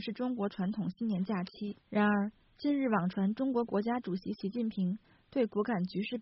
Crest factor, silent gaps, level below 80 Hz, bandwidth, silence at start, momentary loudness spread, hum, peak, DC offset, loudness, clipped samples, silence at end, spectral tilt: 16 dB; none; -70 dBFS; 5.8 kHz; 0 s; 8 LU; none; -18 dBFS; under 0.1%; -34 LUFS; under 0.1%; 0 s; -6 dB/octave